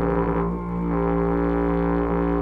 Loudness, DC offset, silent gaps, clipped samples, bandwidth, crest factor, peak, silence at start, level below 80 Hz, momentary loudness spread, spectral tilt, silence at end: -23 LUFS; under 0.1%; none; under 0.1%; 3.8 kHz; 12 dB; -10 dBFS; 0 s; -32 dBFS; 3 LU; -11 dB/octave; 0 s